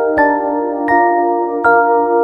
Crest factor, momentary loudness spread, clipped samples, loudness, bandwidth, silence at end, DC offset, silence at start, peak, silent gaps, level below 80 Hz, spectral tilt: 12 dB; 5 LU; under 0.1%; -13 LUFS; 5.6 kHz; 0 s; under 0.1%; 0 s; 0 dBFS; none; -48 dBFS; -7.5 dB/octave